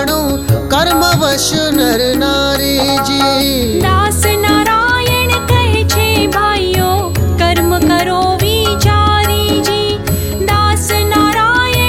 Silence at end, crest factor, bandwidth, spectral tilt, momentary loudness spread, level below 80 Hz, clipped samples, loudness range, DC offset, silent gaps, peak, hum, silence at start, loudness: 0 s; 12 dB; 17 kHz; -4.5 dB/octave; 4 LU; -24 dBFS; under 0.1%; 1 LU; under 0.1%; none; 0 dBFS; none; 0 s; -11 LUFS